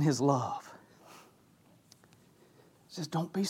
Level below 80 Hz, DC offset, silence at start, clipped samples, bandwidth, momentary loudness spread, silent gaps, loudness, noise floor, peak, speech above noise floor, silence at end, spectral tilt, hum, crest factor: -80 dBFS; under 0.1%; 0 s; under 0.1%; 15.5 kHz; 27 LU; none; -33 LUFS; -63 dBFS; -14 dBFS; 32 dB; 0 s; -6 dB/octave; none; 20 dB